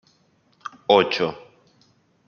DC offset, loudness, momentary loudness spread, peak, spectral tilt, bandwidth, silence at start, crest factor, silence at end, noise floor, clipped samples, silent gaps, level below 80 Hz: under 0.1%; -21 LUFS; 22 LU; -2 dBFS; -5 dB/octave; 6.8 kHz; 0.65 s; 22 dB; 0.9 s; -62 dBFS; under 0.1%; none; -68 dBFS